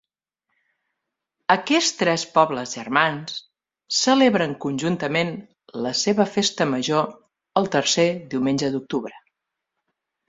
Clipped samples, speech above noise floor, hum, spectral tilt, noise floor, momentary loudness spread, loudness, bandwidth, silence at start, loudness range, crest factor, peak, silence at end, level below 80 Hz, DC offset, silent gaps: under 0.1%; 60 dB; none; -3.5 dB/octave; -81 dBFS; 11 LU; -21 LUFS; 8 kHz; 1.5 s; 3 LU; 22 dB; -2 dBFS; 1.1 s; -64 dBFS; under 0.1%; none